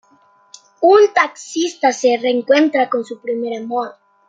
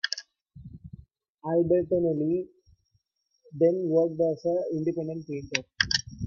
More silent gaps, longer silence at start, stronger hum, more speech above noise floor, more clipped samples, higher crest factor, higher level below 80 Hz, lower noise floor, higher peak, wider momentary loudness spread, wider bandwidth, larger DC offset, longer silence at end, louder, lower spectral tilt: second, none vs 1.30-1.35 s; first, 0.8 s vs 0.05 s; neither; second, 38 dB vs 47 dB; neither; second, 16 dB vs 24 dB; second, -72 dBFS vs -58 dBFS; second, -53 dBFS vs -74 dBFS; about the same, -2 dBFS vs -4 dBFS; second, 12 LU vs 20 LU; first, 9.2 kHz vs 7.2 kHz; neither; first, 0.35 s vs 0 s; first, -16 LUFS vs -27 LUFS; second, -2.5 dB/octave vs -5 dB/octave